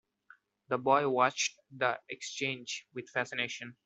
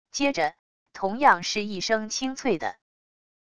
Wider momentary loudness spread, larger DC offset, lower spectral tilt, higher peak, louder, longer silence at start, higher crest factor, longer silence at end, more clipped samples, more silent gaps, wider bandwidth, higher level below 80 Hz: about the same, 11 LU vs 10 LU; second, under 0.1% vs 0.4%; about the same, -3 dB/octave vs -3 dB/octave; second, -12 dBFS vs -6 dBFS; second, -32 LUFS vs -25 LUFS; first, 0.7 s vs 0.05 s; about the same, 22 dB vs 22 dB; second, 0.15 s vs 0.7 s; neither; second, none vs 0.59-0.86 s; second, 8.2 kHz vs 11 kHz; second, -80 dBFS vs -62 dBFS